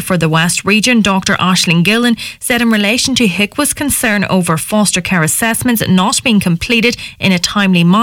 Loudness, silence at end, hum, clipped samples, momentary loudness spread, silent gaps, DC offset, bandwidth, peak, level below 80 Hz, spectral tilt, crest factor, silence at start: -11 LUFS; 0 s; none; under 0.1%; 4 LU; none; under 0.1%; 17.5 kHz; 0 dBFS; -40 dBFS; -4 dB/octave; 12 dB; 0 s